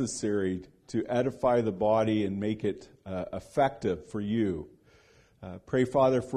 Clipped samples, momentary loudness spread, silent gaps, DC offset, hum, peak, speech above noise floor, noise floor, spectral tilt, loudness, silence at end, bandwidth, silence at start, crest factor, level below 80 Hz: under 0.1%; 14 LU; none; under 0.1%; none; -12 dBFS; 32 dB; -61 dBFS; -6.5 dB/octave; -29 LUFS; 0 s; 12 kHz; 0 s; 18 dB; -58 dBFS